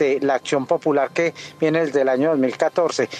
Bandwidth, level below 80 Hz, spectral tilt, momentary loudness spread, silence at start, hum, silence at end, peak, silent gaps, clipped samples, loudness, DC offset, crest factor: 9.8 kHz; -70 dBFS; -5 dB/octave; 3 LU; 0 s; none; 0 s; -4 dBFS; none; under 0.1%; -20 LUFS; under 0.1%; 14 dB